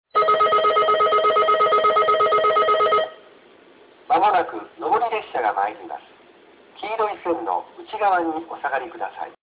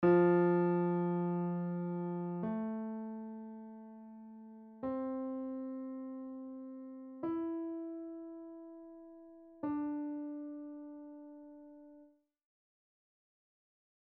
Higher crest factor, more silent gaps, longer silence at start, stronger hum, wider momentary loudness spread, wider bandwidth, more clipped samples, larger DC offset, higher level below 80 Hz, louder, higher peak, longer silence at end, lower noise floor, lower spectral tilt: second, 14 dB vs 20 dB; neither; first, 0.15 s vs 0 s; neither; second, 14 LU vs 21 LU; about the same, 4 kHz vs 4 kHz; neither; neither; first, -62 dBFS vs -78 dBFS; first, -20 LUFS vs -37 LUFS; first, -8 dBFS vs -18 dBFS; second, 0.1 s vs 2 s; second, -50 dBFS vs -64 dBFS; second, -6.5 dB/octave vs -9.5 dB/octave